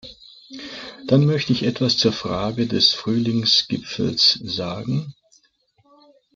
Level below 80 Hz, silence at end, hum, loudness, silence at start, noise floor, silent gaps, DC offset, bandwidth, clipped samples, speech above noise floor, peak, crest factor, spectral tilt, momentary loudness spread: -56 dBFS; 1.25 s; none; -19 LUFS; 0.05 s; -62 dBFS; none; under 0.1%; 7.6 kHz; under 0.1%; 42 dB; -4 dBFS; 18 dB; -5 dB/octave; 18 LU